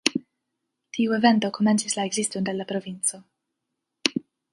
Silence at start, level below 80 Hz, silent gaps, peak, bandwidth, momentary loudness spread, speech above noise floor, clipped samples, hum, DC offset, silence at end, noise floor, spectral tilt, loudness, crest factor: 0.05 s; -70 dBFS; none; 0 dBFS; 11.5 kHz; 11 LU; 58 dB; under 0.1%; none; under 0.1%; 0.3 s; -82 dBFS; -3.5 dB/octave; -24 LUFS; 26 dB